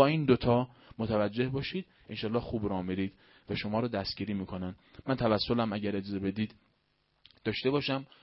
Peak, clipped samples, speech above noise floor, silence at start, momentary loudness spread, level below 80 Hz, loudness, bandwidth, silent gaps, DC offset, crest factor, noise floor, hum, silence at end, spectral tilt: -8 dBFS; under 0.1%; 43 dB; 0 s; 11 LU; -56 dBFS; -32 LUFS; 5.8 kHz; none; under 0.1%; 24 dB; -74 dBFS; none; 0.15 s; -10 dB/octave